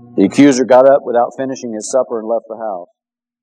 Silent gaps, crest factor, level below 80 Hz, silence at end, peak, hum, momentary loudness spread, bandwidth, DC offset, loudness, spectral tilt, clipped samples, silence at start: none; 14 dB; -64 dBFS; 0.6 s; 0 dBFS; none; 16 LU; 10 kHz; under 0.1%; -13 LUFS; -5.5 dB/octave; 0.3%; 0.15 s